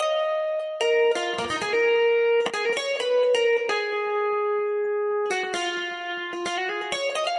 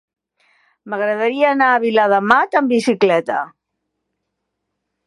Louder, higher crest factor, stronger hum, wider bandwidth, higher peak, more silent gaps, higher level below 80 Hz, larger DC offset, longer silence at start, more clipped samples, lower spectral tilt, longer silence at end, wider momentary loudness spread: second, -24 LUFS vs -15 LUFS; about the same, 14 dB vs 18 dB; neither; about the same, 11.5 kHz vs 11.5 kHz; second, -10 dBFS vs 0 dBFS; neither; second, -70 dBFS vs -64 dBFS; neither; second, 0 s vs 0.85 s; neither; second, -2 dB/octave vs -5 dB/octave; second, 0 s vs 1.6 s; second, 7 LU vs 10 LU